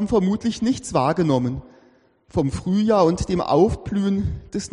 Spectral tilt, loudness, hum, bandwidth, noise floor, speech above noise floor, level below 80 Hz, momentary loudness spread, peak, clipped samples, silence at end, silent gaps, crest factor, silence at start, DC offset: -7 dB/octave; -21 LUFS; none; 11 kHz; -56 dBFS; 36 dB; -40 dBFS; 9 LU; -4 dBFS; under 0.1%; 0.05 s; none; 16 dB; 0 s; under 0.1%